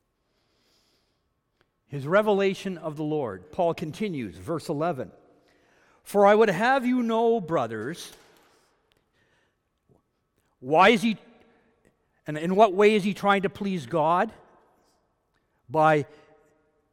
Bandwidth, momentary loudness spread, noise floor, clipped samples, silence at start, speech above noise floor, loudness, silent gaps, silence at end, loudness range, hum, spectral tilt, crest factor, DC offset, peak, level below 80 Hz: 16.5 kHz; 17 LU; -74 dBFS; under 0.1%; 1.9 s; 50 dB; -24 LUFS; none; 0.9 s; 7 LU; none; -6 dB/octave; 22 dB; under 0.1%; -4 dBFS; -66 dBFS